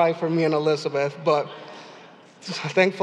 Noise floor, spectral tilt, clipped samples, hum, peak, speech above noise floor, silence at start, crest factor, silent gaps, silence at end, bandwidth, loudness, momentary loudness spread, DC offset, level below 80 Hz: -47 dBFS; -5.5 dB/octave; under 0.1%; none; -4 dBFS; 25 dB; 0 s; 18 dB; none; 0 s; 10.5 kHz; -23 LUFS; 19 LU; under 0.1%; -86 dBFS